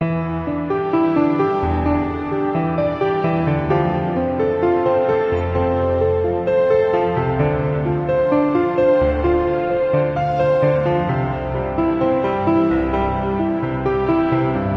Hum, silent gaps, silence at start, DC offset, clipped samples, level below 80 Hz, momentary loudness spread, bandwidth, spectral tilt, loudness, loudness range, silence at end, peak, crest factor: none; none; 0 s; under 0.1%; under 0.1%; -36 dBFS; 4 LU; 6 kHz; -10 dB/octave; -18 LUFS; 2 LU; 0 s; -6 dBFS; 12 dB